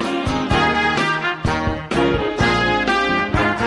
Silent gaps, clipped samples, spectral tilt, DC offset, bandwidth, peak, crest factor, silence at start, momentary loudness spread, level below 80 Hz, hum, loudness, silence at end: none; under 0.1%; -5.5 dB/octave; under 0.1%; 11.5 kHz; -4 dBFS; 16 dB; 0 s; 4 LU; -34 dBFS; none; -18 LUFS; 0 s